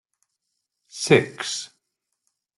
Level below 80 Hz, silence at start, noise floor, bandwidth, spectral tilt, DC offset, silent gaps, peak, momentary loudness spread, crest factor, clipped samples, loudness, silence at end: -66 dBFS; 0.95 s; -79 dBFS; 12 kHz; -4 dB/octave; under 0.1%; none; -2 dBFS; 22 LU; 24 dB; under 0.1%; -22 LUFS; 0.9 s